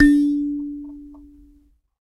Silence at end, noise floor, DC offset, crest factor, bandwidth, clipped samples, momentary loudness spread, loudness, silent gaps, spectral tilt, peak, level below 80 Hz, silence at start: 1 s; -56 dBFS; under 0.1%; 18 dB; 11.5 kHz; under 0.1%; 24 LU; -21 LUFS; none; -5.5 dB/octave; -2 dBFS; -38 dBFS; 0 s